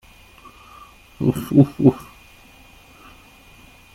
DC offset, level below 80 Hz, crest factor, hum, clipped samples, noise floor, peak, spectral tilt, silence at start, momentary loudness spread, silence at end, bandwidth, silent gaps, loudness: under 0.1%; -50 dBFS; 20 dB; none; under 0.1%; -48 dBFS; -2 dBFS; -8.5 dB/octave; 1.2 s; 9 LU; 1.9 s; 15.5 kHz; none; -18 LUFS